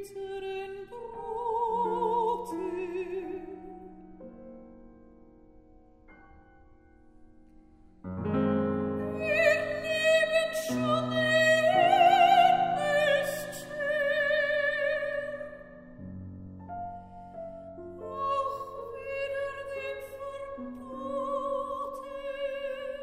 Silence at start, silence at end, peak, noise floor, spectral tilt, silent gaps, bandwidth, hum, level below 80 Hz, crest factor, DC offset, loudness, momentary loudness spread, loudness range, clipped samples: 0 s; 0 s; -10 dBFS; -56 dBFS; -4.5 dB/octave; none; 16 kHz; none; -60 dBFS; 20 dB; under 0.1%; -28 LUFS; 22 LU; 15 LU; under 0.1%